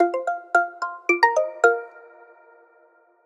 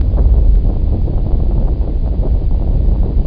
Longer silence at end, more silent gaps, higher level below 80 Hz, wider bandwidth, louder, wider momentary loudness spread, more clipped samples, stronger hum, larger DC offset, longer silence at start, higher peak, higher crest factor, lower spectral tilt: first, 1.25 s vs 0 s; neither; second, under -90 dBFS vs -12 dBFS; first, 11.5 kHz vs 1.6 kHz; second, -21 LUFS vs -16 LUFS; first, 10 LU vs 5 LU; neither; neither; neither; about the same, 0 s vs 0 s; about the same, -2 dBFS vs 0 dBFS; first, 22 dB vs 10 dB; second, -0.5 dB/octave vs -12.5 dB/octave